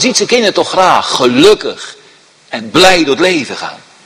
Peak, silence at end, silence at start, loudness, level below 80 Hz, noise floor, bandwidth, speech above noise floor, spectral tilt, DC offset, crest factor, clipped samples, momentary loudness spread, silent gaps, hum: 0 dBFS; 0.3 s; 0 s; -9 LUFS; -46 dBFS; -43 dBFS; 16 kHz; 33 dB; -3 dB/octave; under 0.1%; 10 dB; 2%; 17 LU; none; none